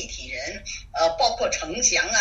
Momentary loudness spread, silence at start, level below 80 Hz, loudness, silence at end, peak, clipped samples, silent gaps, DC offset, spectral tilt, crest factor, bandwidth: 12 LU; 0 s; -44 dBFS; -23 LUFS; 0 s; -6 dBFS; under 0.1%; none; under 0.1%; -0.5 dB/octave; 18 dB; 8 kHz